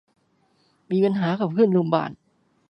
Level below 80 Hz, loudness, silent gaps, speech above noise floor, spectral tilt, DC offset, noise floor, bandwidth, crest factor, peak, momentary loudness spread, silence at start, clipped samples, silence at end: -70 dBFS; -22 LUFS; none; 44 dB; -9.5 dB/octave; under 0.1%; -65 dBFS; 6 kHz; 18 dB; -4 dBFS; 7 LU; 0.9 s; under 0.1%; 0.55 s